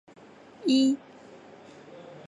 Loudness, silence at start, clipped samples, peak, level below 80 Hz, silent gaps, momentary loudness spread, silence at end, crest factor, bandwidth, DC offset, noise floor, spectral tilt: -26 LUFS; 0.6 s; under 0.1%; -14 dBFS; -80 dBFS; none; 26 LU; 0.1 s; 16 dB; 11.5 kHz; under 0.1%; -50 dBFS; -4 dB/octave